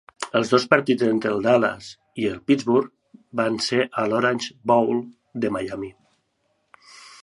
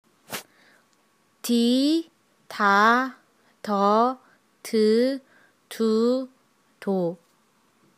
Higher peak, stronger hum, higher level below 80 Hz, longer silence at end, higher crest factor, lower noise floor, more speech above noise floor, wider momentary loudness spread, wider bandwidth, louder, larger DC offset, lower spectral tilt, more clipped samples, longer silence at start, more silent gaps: first, -2 dBFS vs -6 dBFS; neither; first, -62 dBFS vs -86 dBFS; second, 0.15 s vs 0.85 s; about the same, 22 dB vs 20 dB; first, -70 dBFS vs -65 dBFS; first, 49 dB vs 43 dB; second, 14 LU vs 20 LU; second, 11.5 kHz vs 15.5 kHz; about the same, -22 LUFS vs -22 LUFS; neither; about the same, -5 dB/octave vs -5 dB/octave; neither; about the same, 0.2 s vs 0.3 s; neither